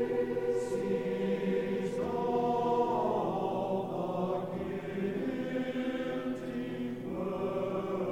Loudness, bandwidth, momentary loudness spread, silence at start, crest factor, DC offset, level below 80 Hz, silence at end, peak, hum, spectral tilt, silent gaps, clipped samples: -33 LUFS; 16 kHz; 7 LU; 0 s; 14 dB; 0.1%; -62 dBFS; 0 s; -18 dBFS; none; -7.5 dB/octave; none; under 0.1%